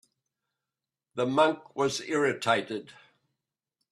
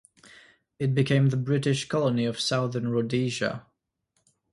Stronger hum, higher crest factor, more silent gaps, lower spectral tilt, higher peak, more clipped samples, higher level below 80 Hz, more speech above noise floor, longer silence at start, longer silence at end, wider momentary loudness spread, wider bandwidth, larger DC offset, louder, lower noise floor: neither; about the same, 22 dB vs 18 dB; neither; second, -4 dB/octave vs -6 dB/octave; about the same, -10 dBFS vs -10 dBFS; neither; second, -74 dBFS vs -64 dBFS; first, 62 dB vs 50 dB; first, 1.15 s vs 0.8 s; about the same, 1 s vs 0.95 s; first, 14 LU vs 7 LU; first, 13 kHz vs 11.5 kHz; neither; about the same, -28 LUFS vs -26 LUFS; first, -90 dBFS vs -76 dBFS